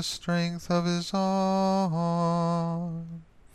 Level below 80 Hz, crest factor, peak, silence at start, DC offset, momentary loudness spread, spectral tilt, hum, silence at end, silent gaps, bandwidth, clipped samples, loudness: -58 dBFS; 14 dB; -14 dBFS; 0 s; under 0.1%; 10 LU; -6 dB/octave; none; 0.3 s; none; 12.5 kHz; under 0.1%; -27 LUFS